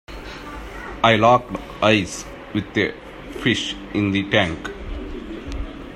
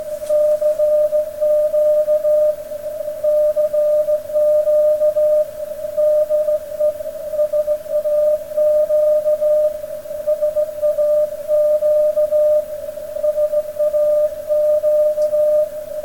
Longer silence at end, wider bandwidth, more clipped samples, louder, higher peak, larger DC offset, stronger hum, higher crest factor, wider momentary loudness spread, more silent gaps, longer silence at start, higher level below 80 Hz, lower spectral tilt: about the same, 0 s vs 0 s; second, 14.5 kHz vs 17.5 kHz; neither; second, -20 LUFS vs -17 LUFS; first, 0 dBFS vs -8 dBFS; second, under 0.1% vs 0.5%; neither; first, 22 dB vs 8 dB; first, 18 LU vs 7 LU; neither; about the same, 0.1 s vs 0 s; first, -38 dBFS vs -52 dBFS; about the same, -5 dB/octave vs -4.5 dB/octave